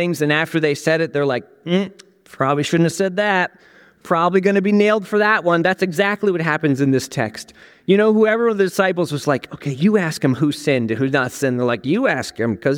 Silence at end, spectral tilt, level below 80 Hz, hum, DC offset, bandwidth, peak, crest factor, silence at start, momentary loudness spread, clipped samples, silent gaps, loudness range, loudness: 0 s; -6 dB/octave; -62 dBFS; none; under 0.1%; 17.5 kHz; -2 dBFS; 16 dB; 0 s; 7 LU; under 0.1%; none; 2 LU; -18 LUFS